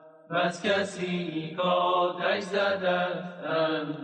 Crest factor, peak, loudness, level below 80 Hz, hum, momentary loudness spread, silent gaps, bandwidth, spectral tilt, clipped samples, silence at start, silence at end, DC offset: 14 dB; -14 dBFS; -28 LUFS; -76 dBFS; none; 6 LU; none; 10 kHz; -5 dB/octave; under 0.1%; 0 s; 0 s; under 0.1%